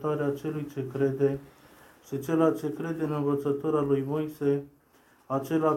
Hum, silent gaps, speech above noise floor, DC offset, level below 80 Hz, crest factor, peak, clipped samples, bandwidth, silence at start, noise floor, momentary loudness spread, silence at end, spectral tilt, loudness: none; none; 34 dB; under 0.1%; -64 dBFS; 18 dB; -10 dBFS; under 0.1%; 16.5 kHz; 0 s; -61 dBFS; 9 LU; 0 s; -8 dB/octave; -29 LUFS